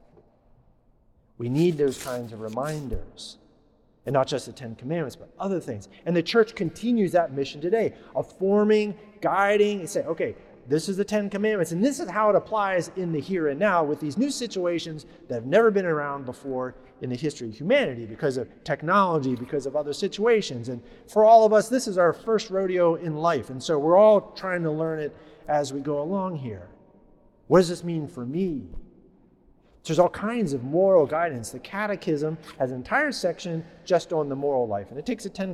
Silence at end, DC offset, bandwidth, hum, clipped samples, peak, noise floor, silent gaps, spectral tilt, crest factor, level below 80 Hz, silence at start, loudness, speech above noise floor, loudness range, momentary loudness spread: 0 s; under 0.1%; 14 kHz; none; under 0.1%; -6 dBFS; -60 dBFS; none; -6 dB/octave; 20 dB; -52 dBFS; 1.4 s; -25 LUFS; 36 dB; 8 LU; 14 LU